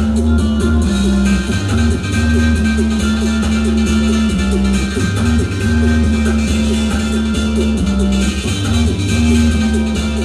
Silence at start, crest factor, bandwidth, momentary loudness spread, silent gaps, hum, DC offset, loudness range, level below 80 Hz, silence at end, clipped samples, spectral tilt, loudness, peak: 0 s; 10 dB; 13 kHz; 3 LU; none; none; under 0.1%; 1 LU; -20 dBFS; 0 s; under 0.1%; -6 dB/octave; -15 LUFS; -4 dBFS